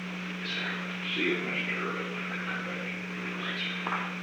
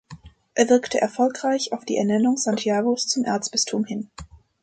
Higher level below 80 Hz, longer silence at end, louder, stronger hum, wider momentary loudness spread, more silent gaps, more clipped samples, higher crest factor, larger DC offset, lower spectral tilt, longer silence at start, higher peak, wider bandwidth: second, -72 dBFS vs -56 dBFS; second, 0 s vs 0.25 s; second, -32 LUFS vs -22 LUFS; neither; about the same, 7 LU vs 8 LU; neither; neither; about the same, 16 dB vs 18 dB; neither; first, -5 dB/octave vs -3.5 dB/octave; about the same, 0 s vs 0.1 s; second, -18 dBFS vs -4 dBFS; first, 19 kHz vs 9.4 kHz